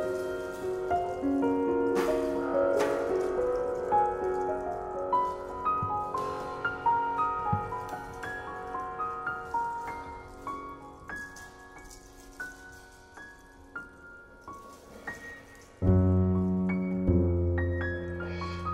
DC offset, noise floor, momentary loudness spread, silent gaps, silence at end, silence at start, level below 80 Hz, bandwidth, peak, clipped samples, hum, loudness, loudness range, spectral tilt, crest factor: under 0.1%; -51 dBFS; 21 LU; none; 0 s; 0 s; -48 dBFS; 14.5 kHz; -12 dBFS; under 0.1%; none; -30 LUFS; 16 LU; -7.5 dB/octave; 20 dB